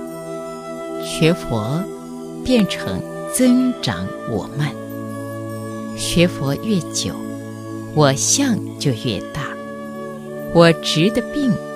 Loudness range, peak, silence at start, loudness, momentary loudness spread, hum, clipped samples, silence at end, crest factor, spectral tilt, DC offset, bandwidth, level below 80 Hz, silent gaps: 4 LU; 0 dBFS; 0 s; -19 LUFS; 15 LU; none; under 0.1%; 0 s; 20 dB; -4.5 dB/octave; under 0.1%; 15.5 kHz; -44 dBFS; none